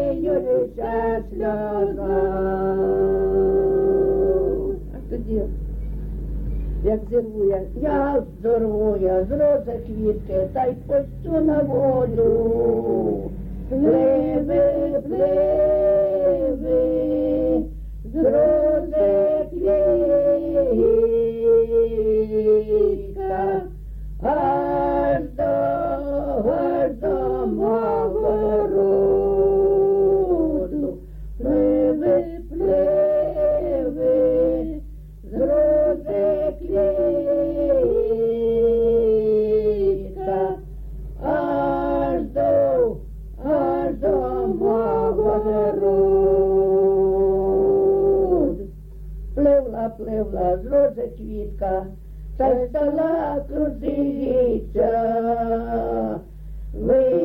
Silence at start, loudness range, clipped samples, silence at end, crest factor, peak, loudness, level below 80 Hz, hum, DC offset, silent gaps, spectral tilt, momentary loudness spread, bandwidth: 0 s; 4 LU; under 0.1%; 0 s; 12 dB; -8 dBFS; -20 LUFS; -34 dBFS; none; under 0.1%; none; -10.5 dB/octave; 11 LU; 4.5 kHz